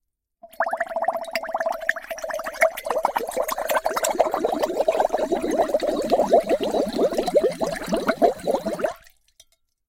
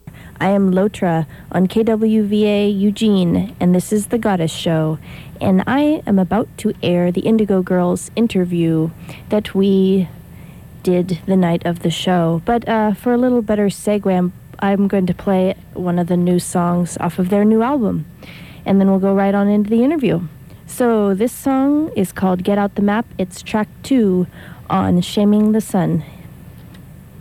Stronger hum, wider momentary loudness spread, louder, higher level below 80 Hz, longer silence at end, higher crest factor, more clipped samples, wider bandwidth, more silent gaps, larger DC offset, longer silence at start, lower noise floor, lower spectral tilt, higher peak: neither; about the same, 7 LU vs 8 LU; second, -23 LUFS vs -17 LUFS; second, -52 dBFS vs -46 dBFS; first, 0.9 s vs 0 s; first, 20 dB vs 12 dB; neither; first, 17 kHz vs 14.5 kHz; neither; neither; first, 0.45 s vs 0.05 s; first, -58 dBFS vs -38 dBFS; second, -3.5 dB/octave vs -7 dB/octave; about the same, -4 dBFS vs -4 dBFS